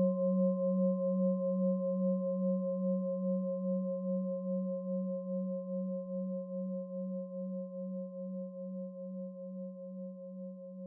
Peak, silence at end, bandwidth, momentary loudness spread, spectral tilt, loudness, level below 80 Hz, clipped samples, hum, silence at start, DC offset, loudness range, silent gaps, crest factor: -22 dBFS; 0 s; 1.1 kHz; 13 LU; -8 dB/octave; -36 LUFS; under -90 dBFS; under 0.1%; none; 0 s; under 0.1%; 9 LU; none; 14 dB